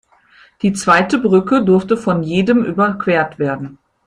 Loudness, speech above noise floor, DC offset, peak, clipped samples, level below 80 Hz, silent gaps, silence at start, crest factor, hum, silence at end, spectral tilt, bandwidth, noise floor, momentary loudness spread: -15 LUFS; 34 dB; under 0.1%; 0 dBFS; under 0.1%; -52 dBFS; none; 0.65 s; 14 dB; none; 0.3 s; -6 dB/octave; 11 kHz; -49 dBFS; 8 LU